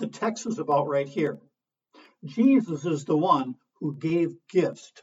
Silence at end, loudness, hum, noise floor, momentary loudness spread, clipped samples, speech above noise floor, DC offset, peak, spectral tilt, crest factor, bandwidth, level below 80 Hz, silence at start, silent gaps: 0.15 s; -26 LUFS; none; -60 dBFS; 13 LU; under 0.1%; 34 dB; under 0.1%; -8 dBFS; -6.5 dB/octave; 18 dB; 8 kHz; -74 dBFS; 0 s; none